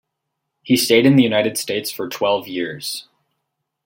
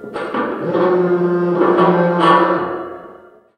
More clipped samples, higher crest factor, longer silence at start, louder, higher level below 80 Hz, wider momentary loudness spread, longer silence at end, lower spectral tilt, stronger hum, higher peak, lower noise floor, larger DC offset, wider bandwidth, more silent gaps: neither; about the same, 18 dB vs 16 dB; first, 0.65 s vs 0 s; second, -18 LUFS vs -15 LUFS; about the same, -62 dBFS vs -64 dBFS; about the same, 14 LU vs 12 LU; first, 0.85 s vs 0.4 s; second, -4.5 dB/octave vs -8 dB/octave; neither; about the same, -2 dBFS vs 0 dBFS; first, -77 dBFS vs -42 dBFS; neither; first, 17 kHz vs 9.4 kHz; neither